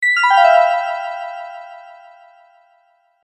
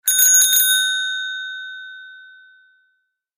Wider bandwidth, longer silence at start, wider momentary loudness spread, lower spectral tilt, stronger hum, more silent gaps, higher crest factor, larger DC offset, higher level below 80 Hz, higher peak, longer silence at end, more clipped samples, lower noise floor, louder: second, 10.5 kHz vs 16 kHz; about the same, 0 s vs 0.05 s; about the same, 23 LU vs 22 LU; first, 3 dB/octave vs 9 dB/octave; neither; neither; about the same, 18 dB vs 18 dB; neither; about the same, -84 dBFS vs -86 dBFS; about the same, 0 dBFS vs -2 dBFS; first, 1.35 s vs 1.15 s; neither; second, -58 dBFS vs -69 dBFS; about the same, -14 LUFS vs -13 LUFS